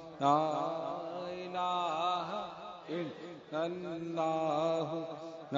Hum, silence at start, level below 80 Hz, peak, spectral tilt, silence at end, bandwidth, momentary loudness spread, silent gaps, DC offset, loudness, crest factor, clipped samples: none; 0 s; -78 dBFS; -14 dBFS; -4.5 dB/octave; 0 s; 7.4 kHz; 12 LU; none; under 0.1%; -35 LUFS; 20 dB; under 0.1%